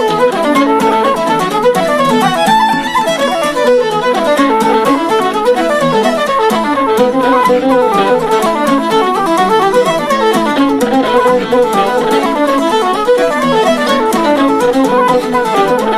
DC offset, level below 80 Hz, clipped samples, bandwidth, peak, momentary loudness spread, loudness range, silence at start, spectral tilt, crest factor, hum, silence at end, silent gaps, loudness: under 0.1%; -44 dBFS; under 0.1%; 15.5 kHz; 0 dBFS; 2 LU; 0 LU; 0 s; -4.5 dB/octave; 10 dB; none; 0 s; none; -11 LUFS